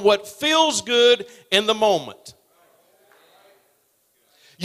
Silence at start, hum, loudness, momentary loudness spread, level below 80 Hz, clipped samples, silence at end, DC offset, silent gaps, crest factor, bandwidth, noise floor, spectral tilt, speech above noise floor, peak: 0 s; none; -18 LUFS; 6 LU; -66 dBFS; under 0.1%; 0 s; under 0.1%; none; 20 dB; 15.5 kHz; -65 dBFS; -2 dB/octave; 45 dB; -2 dBFS